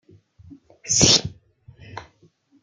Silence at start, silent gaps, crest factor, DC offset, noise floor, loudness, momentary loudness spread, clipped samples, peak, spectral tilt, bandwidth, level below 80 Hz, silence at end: 0.5 s; none; 24 dB; under 0.1%; -59 dBFS; -16 LUFS; 26 LU; under 0.1%; 0 dBFS; -2 dB/octave; 12 kHz; -50 dBFS; 0.6 s